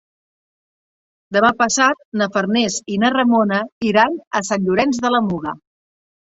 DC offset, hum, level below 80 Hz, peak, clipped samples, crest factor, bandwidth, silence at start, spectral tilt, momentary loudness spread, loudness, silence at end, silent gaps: under 0.1%; none; -56 dBFS; -2 dBFS; under 0.1%; 18 dB; 8 kHz; 1.3 s; -4 dB/octave; 7 LU; -17 LUFS; 0.75 s; 2.05-2.12 s, 3.72-3.81 s, 4.27-4.31 s